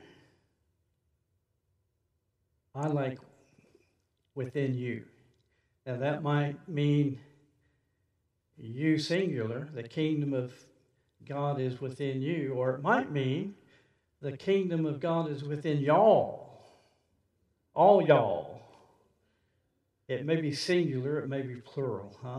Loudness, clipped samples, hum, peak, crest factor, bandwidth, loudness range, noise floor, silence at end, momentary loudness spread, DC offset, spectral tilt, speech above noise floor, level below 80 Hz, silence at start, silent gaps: -30 LUFS; under 0.1%; none; -8 dBFS; 24 dB; 11 kHz; 10 LU; -79 dBFS; 0 s; 17 LU; under 0.1%; -7 dB/octave; 49 dB; -78 dBFS; 2.75 s; none